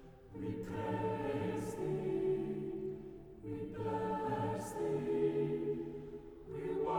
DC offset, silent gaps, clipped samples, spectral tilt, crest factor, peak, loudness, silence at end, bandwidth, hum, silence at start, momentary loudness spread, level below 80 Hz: under 0.1%; none; under 0.1%; -7.5 dB/octave; 14 dB; -24 dBFS; -39 LUFS; 0 s; 19.5 kHz; none; 0 s; 13 LU; -62 dBFS